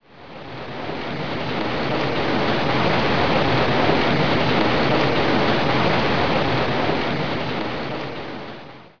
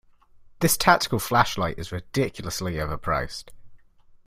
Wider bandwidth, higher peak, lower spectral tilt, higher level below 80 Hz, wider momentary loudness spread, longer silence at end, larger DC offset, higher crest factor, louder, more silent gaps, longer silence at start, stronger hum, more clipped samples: second, 5.4 kHz vs 16 kHz; about the same, -4 dBFS vs -2 dBFS; first, -6.5 dB/octave vs -4 dB/octave; about the same, -42 dBFS vs -44 dBFS; about the same, 13 LU vs 11 LU; second, 0 s vs 0.5 s; first, 4% vs under 0.1%; second, 16 dB vs 24 dB; first, -20 LUFS vs -24 LUFS; neither; second, 0 s vs 0.35 s; neither; neither